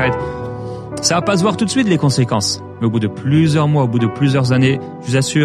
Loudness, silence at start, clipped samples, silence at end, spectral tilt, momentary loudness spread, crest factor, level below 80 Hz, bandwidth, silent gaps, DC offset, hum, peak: -16 LUFS; 0 s; under 0.1%; 0 s; -5.5 dB/octave; 9 LU; 14 dB; -46 dBFS; 13 kHz; none; under 0.1%; none; -2 dBFS